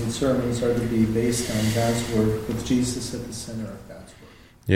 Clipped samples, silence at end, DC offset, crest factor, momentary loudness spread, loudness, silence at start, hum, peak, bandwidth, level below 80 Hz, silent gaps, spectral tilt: under 0.1%; 0 s; under 0.1%; 20 dB; 14 LU; -24 LUFS; 0 s; none; -4 dBFS; 16.5 kHz; -42 dBFS; none; -5.5 dB/octave